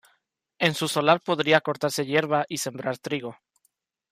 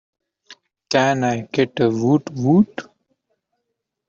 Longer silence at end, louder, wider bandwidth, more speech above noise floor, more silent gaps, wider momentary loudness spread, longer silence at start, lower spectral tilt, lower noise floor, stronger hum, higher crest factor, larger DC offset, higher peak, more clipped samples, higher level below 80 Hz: second, 0.8 s vs 1.25 s; second, -24 LUFS vs -19 LUFS; first, 15.5 kHz vs 7.6 kHz; second, 48 dB vs 60 dB; neither; first, 10 LU vs 5 LU; about the same, 0.6 s vs 0.5 s; second, -4 dB/octave vs -6.5 dB/octave; second, -72 dBFS vs -78 dBFS; neither; about the same, 20 dB vs 18 dB; neither; about the same, -6 dBFS vs -4 dBFS; neither; second, -70 dBFS vs -62 dBFS